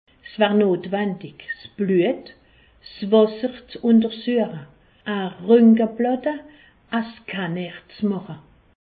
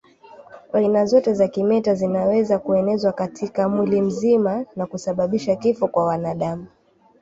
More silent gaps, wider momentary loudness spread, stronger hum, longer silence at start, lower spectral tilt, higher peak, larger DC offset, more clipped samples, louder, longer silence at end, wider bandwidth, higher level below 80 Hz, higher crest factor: neither; first, 17 LU vs 9 LU; neither; second, 0.25 s vs 0.4 s; first, -11.5 dB/octave vs -7.5 dB/octave; about the same, -4 dBFS vs -4 dBFS; neither; neither; about the same, -21 LUFS vs -20 LUFS; about the same, 0.45 s vs 0.55 s; second, 4.8 kHz vs 8 kHz; about the same, -62 dBFS vs -58 dBFS; about the same, 18 dB vs 16 dB